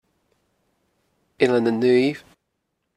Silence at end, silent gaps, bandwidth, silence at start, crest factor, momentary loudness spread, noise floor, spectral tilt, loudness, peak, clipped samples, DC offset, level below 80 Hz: 0.8 s; none; 11 kHz; 1.4 s; 20 dB; 7 LU; -76 dBFS; -6.5 dB/octave; -20 LUFS; -4 dBFS; under 0.1%; under 0.1%; -66 dBFS